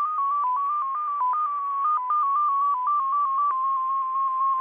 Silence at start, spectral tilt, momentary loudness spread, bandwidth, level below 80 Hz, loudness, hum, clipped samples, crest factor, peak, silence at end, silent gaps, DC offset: 0 s; -4 dB/octave; 3 LU; 3.6 kHz; -80 dBFS; -24 LUFS; none; under 0.1%; 6 dB; -18 dBFS; 0 s; none; under 0.1%